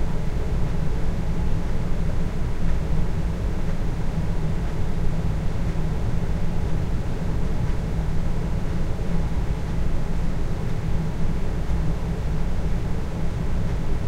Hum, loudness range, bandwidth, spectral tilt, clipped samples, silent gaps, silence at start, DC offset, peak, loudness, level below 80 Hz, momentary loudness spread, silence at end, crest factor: none; 0 LU; 8.4 kHz; -7.5 dB/octave; under 0.1%; none; 0 s; under 0.1%; -8 dBFS; -27 LUFS; -24 dBFS; 2 LU; 0 s; 12 dB